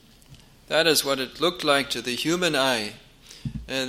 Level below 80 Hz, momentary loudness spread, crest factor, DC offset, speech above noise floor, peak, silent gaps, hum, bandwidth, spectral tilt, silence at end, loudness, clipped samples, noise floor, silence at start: -52 dBFS; 15 LU; 22 dB; under 0.1%; 27 dB; -4 dBFS; none; none; 16.5 kHz; -3 dB/octave; 0 s; -23 LUFS; under 0.1%; -51 dBFS; 0.3 s